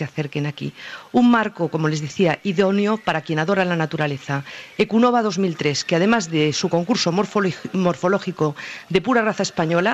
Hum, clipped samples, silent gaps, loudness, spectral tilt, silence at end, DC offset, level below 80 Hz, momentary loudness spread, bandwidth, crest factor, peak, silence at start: none; under 0.1%; none; -20 LUFS; -5.5 dB/octave; 0 s; under 0.1%; -58 dBFS; 9 LU; 8.6 kHz; 16 dB; -4 dBFS; 0 s